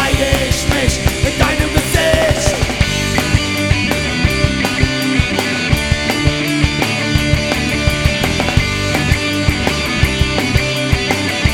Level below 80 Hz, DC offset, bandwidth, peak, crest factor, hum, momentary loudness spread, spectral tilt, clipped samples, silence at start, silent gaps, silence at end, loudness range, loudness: -22 dBFS; under 0.1%; 18.5 kHz; 0 dBFS; 14 dB; none; 2 LU; -4.5 dB/octave; under 0.1%; 0 s; none; 0 s; 1 LU; -14 LUFS